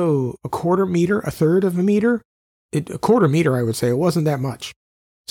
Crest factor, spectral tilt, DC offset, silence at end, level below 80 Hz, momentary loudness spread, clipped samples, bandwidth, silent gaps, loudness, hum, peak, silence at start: 14 dB; -7 dB/octave; under 0.1%; 0.6 s; -54 dBFS; 10 LU; under 0.1%; 17.5 kHz; 2.25-2.69 s; -19 LUFS; none; -6 dBFS; 0 s